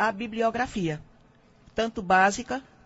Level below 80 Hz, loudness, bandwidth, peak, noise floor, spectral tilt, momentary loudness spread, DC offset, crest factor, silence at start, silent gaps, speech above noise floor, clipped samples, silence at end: -54 dBFS; -26 LUFS; 8 kHz; -8 dBFS; -58 dBFS; -4.5 dB/octave; 14 LU; under 0.1%; 18 dB; 0 s; none; 32 dB; under 0.1%; 0.25 s